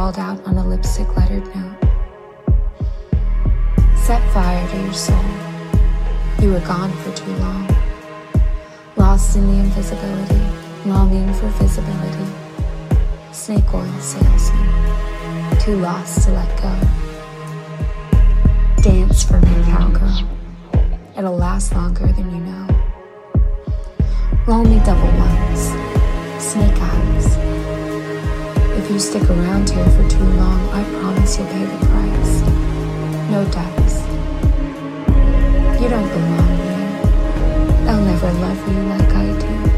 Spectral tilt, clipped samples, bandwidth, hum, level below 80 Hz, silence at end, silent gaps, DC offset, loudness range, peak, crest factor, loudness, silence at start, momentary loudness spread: -6.5 dB/octave; under 0.1%; 13 kHz; none; -16 dBFS; 0 s; none; under 0.1%; 4 LU; -2 dBFS; 12 dB; -18 LUFS; 0 s; 10 LU